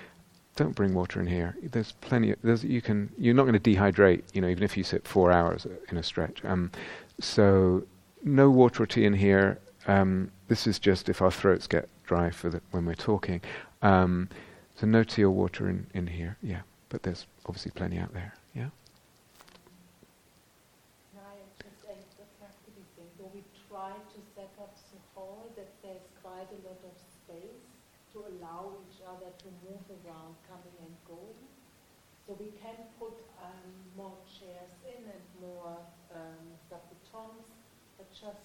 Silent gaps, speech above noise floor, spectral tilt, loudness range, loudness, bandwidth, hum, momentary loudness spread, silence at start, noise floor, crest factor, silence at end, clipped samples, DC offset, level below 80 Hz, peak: none; 36 dB; -7 dB/octave; 25 LU; -27 LUFS; 15 kHz; none; 27 LU; 0 s; -63 dBFS; 24 dB; 0.15 s; under 0.1%; under 0.1%; -54 dBFS; -6 dBFS